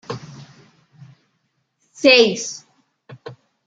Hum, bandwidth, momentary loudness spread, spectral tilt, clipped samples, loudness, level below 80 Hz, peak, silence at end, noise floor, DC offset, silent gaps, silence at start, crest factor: none; 9 kHz; 28 LU; -3 dB/octave; under 0.1%; -15 LUFS; -68 dBFS; -2 dBFS; 0.35 s; -70 dBFS; under 0.1%; none; 0.1 s; 22 dB